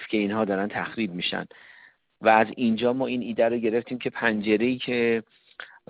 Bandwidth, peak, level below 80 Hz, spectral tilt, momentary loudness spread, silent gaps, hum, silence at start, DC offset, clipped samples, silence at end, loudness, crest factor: 5 kHz; -4 dBFS; -64 dBFS; -3.5 dB/octave; 9 LU; none; none; 0 s; under 0.1%; under 0.1%; 0.25 s; -25 LUFS; 22 dB